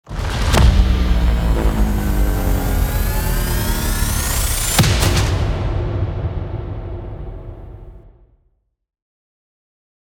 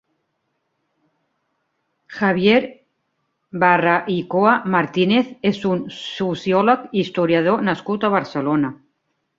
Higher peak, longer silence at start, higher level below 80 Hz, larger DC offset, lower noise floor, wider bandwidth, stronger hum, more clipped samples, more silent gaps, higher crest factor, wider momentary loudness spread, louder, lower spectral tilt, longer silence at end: about the same, 0 dBFS vs -2 dBFS; second, 0.05 s vs 2.1 s; first, -20 dBFS vs -62 dBFS; neither; second, -63 dBFS vs -72 dBFS; first, 19 kHz vs 7.6 kHz; neither; neither; neither; about the same, 18 dB vs 18 dB; first, 16 LU vs 9 LU; about the same, -18 LUFS vs -19 LUFS; second, -4.5 dB/octave vs -7 dB/octave; first, 2.05 s vs 0.65 s